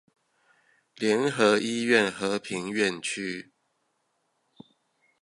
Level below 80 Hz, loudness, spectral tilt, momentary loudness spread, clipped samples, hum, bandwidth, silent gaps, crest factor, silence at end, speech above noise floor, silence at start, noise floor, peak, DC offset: -72 dBFS; -26 LUFS; -4 dB/octave; 9 LU; under 0.1%; none; 11.5 kHz; none; 22 dB; 1.8 s; 49 dB; 1 s; -75 dBFS; -6 dBFS; under 0.1%